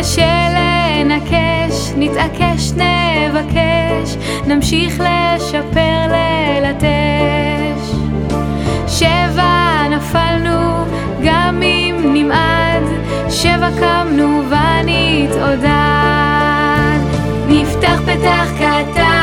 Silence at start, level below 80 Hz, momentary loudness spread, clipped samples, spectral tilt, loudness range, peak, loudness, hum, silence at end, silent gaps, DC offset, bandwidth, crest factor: 0 s; -26 dBFS; 5 LU; under 0.1%; -5.5 dB/octave; 2 LU; 0 dBFS; -13 LUFS; none; 0 s; none; under 0.1%; 17 kHz; 12 dB